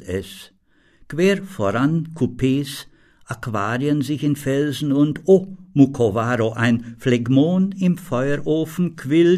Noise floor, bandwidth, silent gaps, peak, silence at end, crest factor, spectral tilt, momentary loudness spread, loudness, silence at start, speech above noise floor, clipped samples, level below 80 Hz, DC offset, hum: -54 dBFS; 14 kHz; none; 0 dBFS; 0 s; 18 dB; -7 dB/octave; 11 LU; -20 LUFS; 0 s; 35 dB; under 0.1%; -50 dBFS; under 0.1%; none